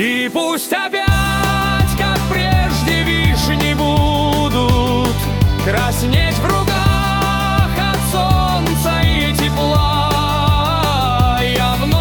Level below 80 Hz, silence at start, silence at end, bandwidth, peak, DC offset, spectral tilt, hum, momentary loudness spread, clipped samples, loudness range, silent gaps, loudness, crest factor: -24 dBFS; 0 s; 0 s; 19 kHz; 0 dBFS; under 0.1%; -5 dB/octave; none; 2 LU; under 0.1%; 1 LU; none; -15 LUFS; 14 dB